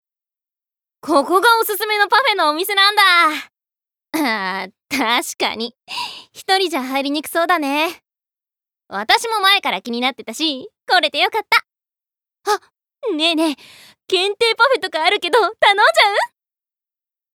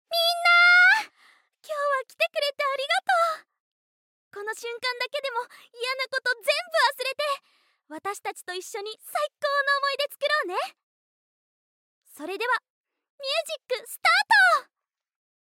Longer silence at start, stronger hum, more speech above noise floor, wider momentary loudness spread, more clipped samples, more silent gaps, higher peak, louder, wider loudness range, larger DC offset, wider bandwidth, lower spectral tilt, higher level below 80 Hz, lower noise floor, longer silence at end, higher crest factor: first, 1.05 s vs 0.1 s; neither; first, 71 dB vs 40 dB; second, 14 LU vs 18 LU; neither; second, none vs 3.60-4.31 s, 10.83-12.02 s, 12.70-12.84 s, 13.10-13.18 s; first, -2 dBFS vs -8 dBFS; first, -16 LUFS vs -23 LUFS; about the same, 6 LU vs 8 LU; neither; first, over 20 kHz vs 17 kHz; first, -1 dB/octave vs 1.5 dB/octave; first, -72 dBFS vs under -90 dBFS; first, -88 dBFS vs -66 dBFS; first, 1.1 s vs 0.85 s; about the same, 16 dB vs 18 dB